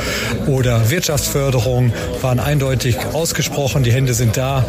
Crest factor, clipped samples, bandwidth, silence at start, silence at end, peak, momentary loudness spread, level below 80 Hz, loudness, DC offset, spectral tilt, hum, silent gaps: 12 dB; under 0.1%; 16 kHz; 0 s; 0 s; -4 dBFS; 3 LU; -32 dBFS; -17 LUFS; under 0.1%; -5 dB/octave; none; none